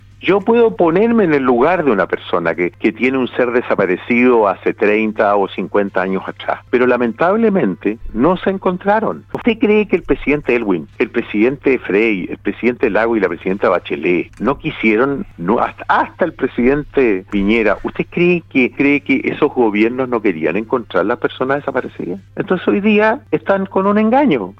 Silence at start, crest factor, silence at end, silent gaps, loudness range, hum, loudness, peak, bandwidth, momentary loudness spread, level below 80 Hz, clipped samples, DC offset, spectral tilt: 0.2 s; 14 dB; 0.05 s; none; 2 LU; none; -15 LUFS; 0 dBFS; 6.2 kHz; 7 LU; -40 dBFS; under 0.1%; under 0.1%; -8.5 dB/octave